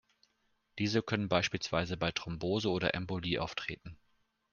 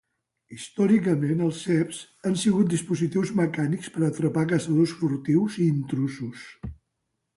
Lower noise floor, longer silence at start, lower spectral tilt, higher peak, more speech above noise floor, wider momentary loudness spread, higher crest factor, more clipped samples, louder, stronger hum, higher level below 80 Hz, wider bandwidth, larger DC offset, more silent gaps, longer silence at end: about the same, -76 dBFS vs -79 dBFS; first, 0.75 s vs 0.5 s; second, -5 dB/octave vs -6.5 dB/octave; about the same, -12 dBFS vs -10 dBFS; second, 42 dB vs 55 dB; second, 10 LU vs 14 LU; first, 24 dB vs 14 dB; neither; second, -34 LUFS vs -25 LUFS; neither; about the same, -60 dBFS vs -56 dBFS; second, 7.2 kHz vs 11.5 kHz; neither; neither; about the same, 0.55 s vs 0.65 s